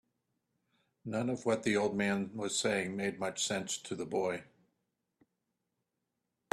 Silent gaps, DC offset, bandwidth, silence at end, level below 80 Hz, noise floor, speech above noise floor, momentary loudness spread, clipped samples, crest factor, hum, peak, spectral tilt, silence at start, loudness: none; under 0.1%; 13 kHz; 2.1 s; -74 dBFS; -86 dBFS; 51 dB; 7 LU; under 0.1%; 20 dB; none; -18 dBFS; -3.5 dB/octave; 1.05 s; -34 LUFS